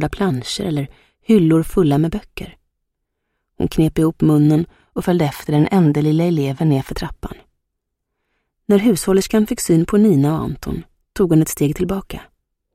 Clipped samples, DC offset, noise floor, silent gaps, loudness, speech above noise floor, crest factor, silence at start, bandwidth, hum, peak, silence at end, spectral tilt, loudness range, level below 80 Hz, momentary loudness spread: under 0.1%; under 0.1%; -76 dBFS; none; -17 LUFS; 60 dB; 16 dB; 0 s; 15.5 kHz; none; 0 dBFS; 0.5 s; -7 dB/octave; 3 LU; -38 dBFS; 17 LU